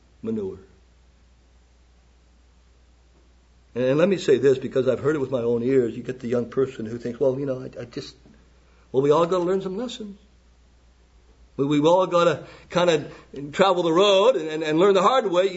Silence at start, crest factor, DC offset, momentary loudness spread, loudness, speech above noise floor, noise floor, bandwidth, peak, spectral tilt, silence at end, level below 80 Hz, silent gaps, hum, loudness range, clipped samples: 0.25 s; 20 dB; under 0.1%; 16 LU; -22 LUFS; 34 dB; -56 dBFS; 8 kHz; -4 dBFS; -6 dB/octave; 0 s; -56 dBFS; none; none; 7 LU; under 0.1%